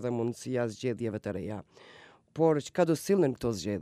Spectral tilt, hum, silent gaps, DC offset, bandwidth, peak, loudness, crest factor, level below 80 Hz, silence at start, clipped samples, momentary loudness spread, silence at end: -6.5 dB/octave; none; none; under 0.1%; 15.5 kHz; -12 dBFS; -30 LUFS; 18 dB; -62 dBFS; 0 s; under 0.1%; 11 LU; 0 s